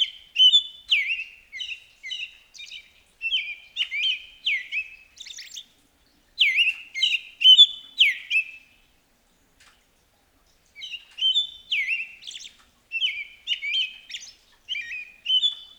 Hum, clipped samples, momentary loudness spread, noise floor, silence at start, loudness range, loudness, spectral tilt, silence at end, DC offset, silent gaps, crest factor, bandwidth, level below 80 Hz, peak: none; under 0.1%; 24 LU; -64 dBFS; 0 s; 11 LU; -20 LUFS; 4 dB/octave; 0.15 s; under 0.1%; none; 22 dB; 20 kHz; -68 dBFS; -4 dBFS